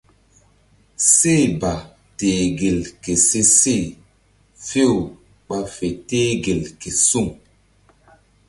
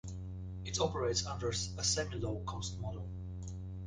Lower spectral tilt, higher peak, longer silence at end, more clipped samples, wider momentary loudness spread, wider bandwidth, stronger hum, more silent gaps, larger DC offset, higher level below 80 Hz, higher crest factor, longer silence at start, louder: about the same, -3.5 dB/octave vs -3.5 dB/octave; first, 0 dBFS vs -18 dBFS; first, 1.15 s vs 0 s; neither; first, 15 LU vs 12 LU; first, 12 kHz vs 10 kHz; first, 50 Hz at -50 dBFS vs none; neither; neither; first, -44 dBFS vs -50 dBFS; about the same, 20 dB vs 20 dB; first, 1 s vs 0.05 s; first, -17 LUFS vs -37 LUFS